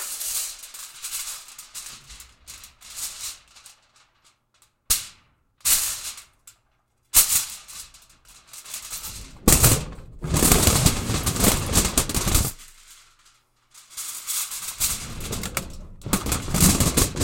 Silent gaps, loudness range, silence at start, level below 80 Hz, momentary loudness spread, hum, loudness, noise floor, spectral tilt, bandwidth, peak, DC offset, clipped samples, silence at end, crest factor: none; 14 LU; 0 s; -34 dBFS; 24 LU; none; -22 LUFS; -67 dBFS; -3 dB/octave; 17 kHz; -2 dBFS; under 0.1%; under 0.1%; 0 s; 24 dB